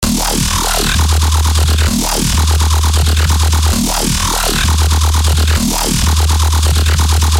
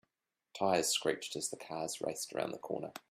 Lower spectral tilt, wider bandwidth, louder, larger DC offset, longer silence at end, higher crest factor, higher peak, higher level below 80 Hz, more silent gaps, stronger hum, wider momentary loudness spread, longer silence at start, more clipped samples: about the same, -3.5 dB/octave vs -2.5 dB/octave; about the same, 16.5 kHz vs 15.5 kHz; first, -12 LUFS vs -36 LUFS; neither; about the same, 0 s vs 0.1 s; second, 10 dB vs 22 dB; first, -2 dBFS vs -16 dBFS; first, -14 dBFS vs -78 dBFS; neither; neither; second, 1 LU vs 10 LU; second, 0 s vs 0.55 s; neither